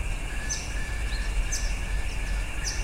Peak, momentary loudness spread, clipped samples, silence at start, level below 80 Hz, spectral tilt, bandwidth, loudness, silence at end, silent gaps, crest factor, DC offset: -16 dBFS; 3 LU; under 0.1%; 0 s; -30 dBFS; -2.5 dB/octave; 15.5 kHz; -32 LUFS; 0 s; none; 12 dB; under 0.1%